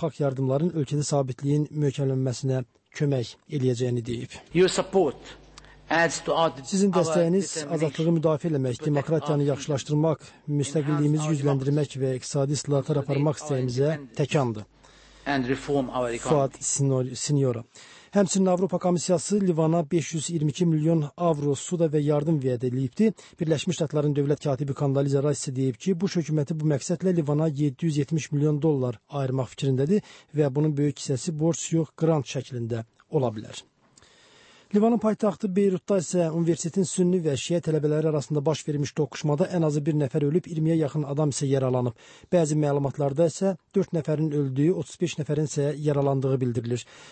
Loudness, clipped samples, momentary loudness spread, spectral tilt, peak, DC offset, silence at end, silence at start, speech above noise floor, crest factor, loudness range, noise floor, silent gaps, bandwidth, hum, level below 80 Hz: -25 LUFS; under 0.1%; 6 LU; -6 dB/octave; -10 dBFS; under 0.1%; 0 s; 0 s; 33 dB; 16 dB; 2 LU; -58 dBFS; none; 8.8 kHz; none; -60 dBFS